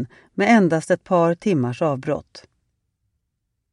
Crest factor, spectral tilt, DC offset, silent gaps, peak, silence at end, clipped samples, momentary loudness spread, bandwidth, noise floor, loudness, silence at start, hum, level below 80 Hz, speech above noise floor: 16 dB; -7 dB/octave; under 0.1%; none; -4 dBFS; 1.35 s; under 0.1%; 11 LU; 11 kHz; -76 dBFS; -20 LUFS; 0 s; none; -62 dBFS; 56 dB